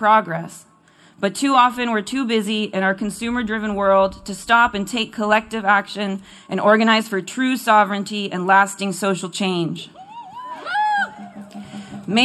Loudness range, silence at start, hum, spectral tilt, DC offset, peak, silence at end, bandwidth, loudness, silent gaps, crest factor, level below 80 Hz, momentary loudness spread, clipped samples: 3 LU; 0 s; none; -4 dB/octave; under 0.1%; -2 dBFS; 0 s; 13.5 kHz; -19 LUFS; none; 18 dB; -54 dBFS; 18 LU; under 0.1%